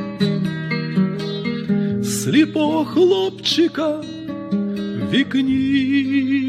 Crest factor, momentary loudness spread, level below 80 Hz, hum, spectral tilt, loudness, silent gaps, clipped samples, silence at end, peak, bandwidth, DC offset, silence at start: 14 dB; 8 LU; -56 dBFS; none; -5.5 dB/octave; -19 LUFS; none; under 0.1%; 0 s; -4 dBFS; 15.5 kHz; under 0.1%; 0 s